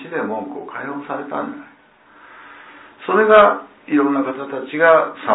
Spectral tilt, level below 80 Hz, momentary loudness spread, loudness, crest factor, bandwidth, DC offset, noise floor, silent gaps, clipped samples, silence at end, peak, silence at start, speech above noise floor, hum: -9.5 dB/octave; -60 dBFS; 18 LU; -17 LUFS; 18 dB; 4 kHz; under 0.1%; -48 dBFS; none; under 0.1%; 0 s; 0 dBFS; 0 s; 31 dB; none